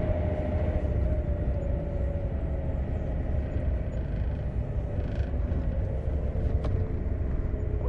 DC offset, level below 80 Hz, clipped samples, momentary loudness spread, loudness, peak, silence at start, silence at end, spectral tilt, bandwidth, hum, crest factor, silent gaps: under 0.1%; -30 dBFS; under 0.1%; 3 LU; -31 LUFS; -14 dBFS; 0 s; 0 s; -10 dB/octave; 4.3 kHz; none; 14 dB; none